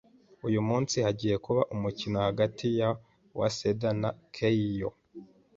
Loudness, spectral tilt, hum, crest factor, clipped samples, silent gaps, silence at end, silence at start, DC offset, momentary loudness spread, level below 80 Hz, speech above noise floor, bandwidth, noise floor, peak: -30 LUFS; -6 dB/octave; none; 18 dB; under 0.1%; none; 0.3 s; 0.45 s; under 0.1%; 7 LU; -58 dBFS; 22 dB; 7.8 kHz; -51 dBFS; -12 dBFS